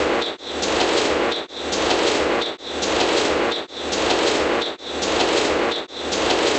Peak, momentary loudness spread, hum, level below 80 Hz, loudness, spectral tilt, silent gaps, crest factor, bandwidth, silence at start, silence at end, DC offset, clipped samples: -4 dBFS; 7 LU; none; -46 dBFS; -20 LUFS; -2.5 dB/octave; none; 16 dB; 10.5 kHz; 0 s; 0 s; under 0.1%; under 0.1%